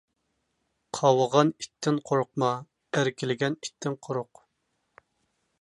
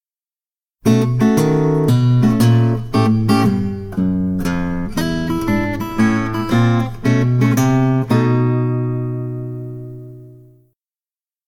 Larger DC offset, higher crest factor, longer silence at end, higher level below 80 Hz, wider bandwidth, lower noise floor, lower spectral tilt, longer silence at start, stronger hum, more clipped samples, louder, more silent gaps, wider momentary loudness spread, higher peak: neither; first, 22 dB vs 14 dB; first, 1.4 s vs 1.1 s; second, -74 dBFS vs -38 dBFS; second, 11.5 kHz vs 16 kHz; second, -77 dBFS vs under -90 dBFS; second, -5.5 dB/octave vs -7.5 dB/octave; about the same, 0.95 s vs 0.85 s; neither; neither; second, -27 LUFS vs -16 LUFS; neither; first, 12 LU vs 9 LU; second, -6 dBFS vs -2 dBFS